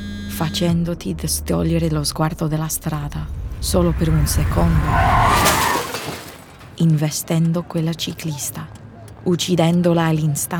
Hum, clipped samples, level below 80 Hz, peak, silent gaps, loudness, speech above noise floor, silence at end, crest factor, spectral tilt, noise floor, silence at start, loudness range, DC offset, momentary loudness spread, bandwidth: none; under 0.1%; -30 dBFS; -4 dBFS; none; -19 LUFS; 21 dB; 0 s; 16 dB; -5 dB/octave; -39 dBFS; 0 s; 4 LU; under 0.1%; 13 LU; over 20 kHz